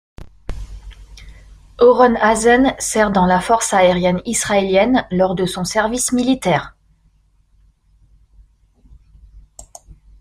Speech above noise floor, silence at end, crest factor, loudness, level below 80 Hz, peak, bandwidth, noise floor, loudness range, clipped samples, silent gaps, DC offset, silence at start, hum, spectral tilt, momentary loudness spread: 41 dB; 0.3 s; 16 dB; -15 LUFS; -40 dBFS; -2 dBFS; 16 kHz; -56 dBFS; 8 LU; under 0.1%; none; under 0.1%; 0.2 s; none; -4.5 dB/octave; 13 LU